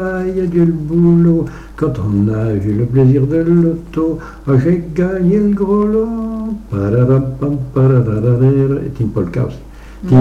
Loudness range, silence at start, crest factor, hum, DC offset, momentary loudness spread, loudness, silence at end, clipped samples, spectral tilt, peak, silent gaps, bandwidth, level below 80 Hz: 2 LU; 0 s; 12 dB; none; under 0.1%; 9 LU; -14 LUFS; 0 s; under 0.1%; -10.5 dB/octave; -2 dBFS; none; 6.6 kHz; -34 dBFS